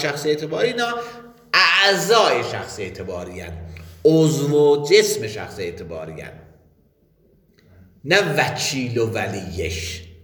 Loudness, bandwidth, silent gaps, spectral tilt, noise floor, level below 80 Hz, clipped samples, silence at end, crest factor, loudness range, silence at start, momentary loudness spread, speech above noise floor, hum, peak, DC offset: -19 LUFS; 19.5 kHz; none; -4 dB/octave; -59 dBFS; -48 dBFS; under 0.1%; 0.1 s; 20 dB; 6 LU; 0 s; 19 LU; 39 dB; none; 0 dBFS; under 0.1%